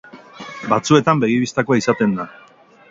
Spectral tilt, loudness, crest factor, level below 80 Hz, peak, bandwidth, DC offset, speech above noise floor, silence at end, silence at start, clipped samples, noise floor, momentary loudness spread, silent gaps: -5.5 dB/octave; -17 LUFS; 18 dB; -58 dBFS; 0 dBFS; 8 kHz; under 0.1%; 20 dB; 0.6 s; 0.15 s; under 0.1%; -37 dBFS; 18 LU; none